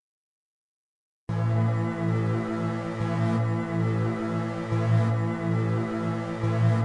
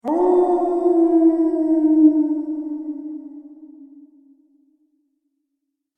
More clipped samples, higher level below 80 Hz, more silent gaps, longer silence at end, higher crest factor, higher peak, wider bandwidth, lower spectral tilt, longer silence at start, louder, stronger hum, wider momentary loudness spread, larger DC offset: neither; about the same, -58 dBFS vs -62 dBFS; neither; second, 0 s vs 2.1 s; about the same, 14 dB vs 16 dB; second, -12 dBFS vs -4 dBFS; first, 9.2 kHz vs 2.1 kHz; about the same, -8.5 dB/octave vs -8 dB/octave; first, 1.3 s vs 0.05 s; second, -27 LUFS vs -17 LUFS; neither; second, 6 LU vs 17 LU; neither